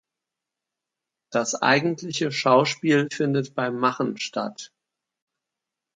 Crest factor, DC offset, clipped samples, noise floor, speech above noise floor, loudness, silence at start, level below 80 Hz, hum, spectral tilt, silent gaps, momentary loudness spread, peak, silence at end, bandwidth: 22 dB; under 0.1%; under 0.1%; -86 dBFS; 63 dB; -23 LUFS; 1.3 s; -74 dBFS; none; -4.5 dB/octave; none; 10 LU; -4 dBFS; 1.3 s; 9.6 kHz